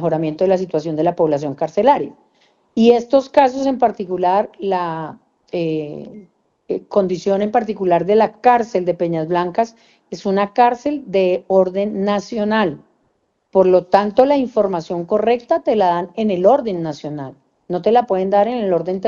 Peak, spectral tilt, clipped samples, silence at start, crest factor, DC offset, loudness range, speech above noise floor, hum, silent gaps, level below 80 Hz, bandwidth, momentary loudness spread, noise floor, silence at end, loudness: 0 dBFS; -7 dB/octave; under 0.1%; 0 s; 16 dB; under 0.1%; 4 LU; 49 dB; none; none; -58 dBFS; 7.4 kHz; 12 LU; -65 dBFS; 0 s; -17 LUFS